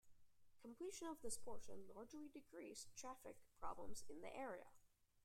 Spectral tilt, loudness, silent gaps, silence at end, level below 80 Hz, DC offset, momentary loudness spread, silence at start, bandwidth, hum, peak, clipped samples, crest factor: -3 dB/octave; -56 LUFS; none; 0.4 s; -72 dBFS; under 0.1%; 8 LU; 0.05 s; 16 kHz; none; -34 dBFS; under 0.1%; 18 dB